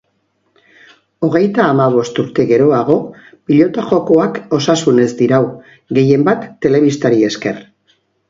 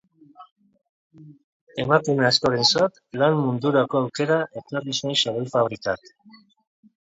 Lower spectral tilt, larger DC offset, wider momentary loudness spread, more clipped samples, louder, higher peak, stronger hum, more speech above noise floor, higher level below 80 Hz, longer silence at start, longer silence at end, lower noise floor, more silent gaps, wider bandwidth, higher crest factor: first, -6.5 dB/octave vs -4.5 dB/octave; neither; second, 8 LU vs 11 LU; neither; first, -13 LUFS vs -22 LUFS; about the same, 0 dBFS vs -2 dBFS; neither; first, 51 dB vs 27 dB; first, -54 dBFS vs -62 dBFS; first, 1.2 s vs 0.4 s; second, 0.7 s vs 1.05 s; first, -63 dBFS vs -50 dBFS; second, none vs 0.51-0.56 s, 0.89-1.10 s, 1.44-1.67 s; about the same, 7.8 kHz vs 8 kHz; second, 14 dB vs 22 dB